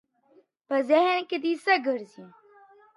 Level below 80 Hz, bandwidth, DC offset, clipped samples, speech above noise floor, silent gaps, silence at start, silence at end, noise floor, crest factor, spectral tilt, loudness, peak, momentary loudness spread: -86 dBFS; 11.5 kHz; under 0.1%; under 0.1%; 37 dB; none; 0.7 s; 0.7 s; -62 dBFS; 18 dB; -4 dB/octave; -25 LUFS; -10 dBFS; 10 LU